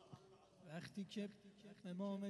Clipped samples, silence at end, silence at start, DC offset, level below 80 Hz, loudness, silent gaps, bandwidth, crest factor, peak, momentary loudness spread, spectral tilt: under 0.1%; 0 s; 0 s; under 0.1%; -86 dBFS; -51 LUFS; none; 12 kHz; 16 dB; -36 dBFS; 16 LU; -6.5 dB/octave